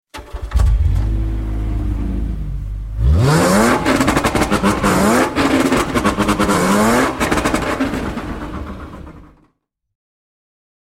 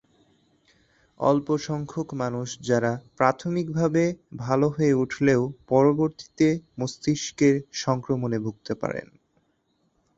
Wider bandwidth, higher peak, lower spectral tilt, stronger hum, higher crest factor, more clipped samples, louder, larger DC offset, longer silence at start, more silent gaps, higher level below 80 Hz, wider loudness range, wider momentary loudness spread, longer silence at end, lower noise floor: first, 16.5 kHz vs 8 kHz; first, 0 dBFS vs -4 dBFS; about the same, -5.5 dB/octave vs -6.5 dB/octave; neither; about the same, 16 dB vs 20 dB; neither; first, -16 LUFS vs -25 LUFS; neither; second, 0.15 s vs 1.2 s; neither; first, -24 dBFS vs -60 dBFS; first, 7 LU vs 4 LU; first, 14 LU vs 9 LU; first, 1.65 s vs 1.15 s; second, -64 dBFS vs -70 dBFS